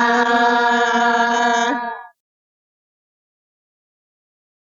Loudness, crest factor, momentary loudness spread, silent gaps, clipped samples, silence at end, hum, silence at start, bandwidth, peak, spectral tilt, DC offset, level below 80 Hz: -16 LUFS; 16 dB; 10 LU; none; under 0.1%; 2.65 s; none; 0 s; 7.6 kHz; -4 dBFS; -2 dB/octave; under 0.1%; -68 dBFS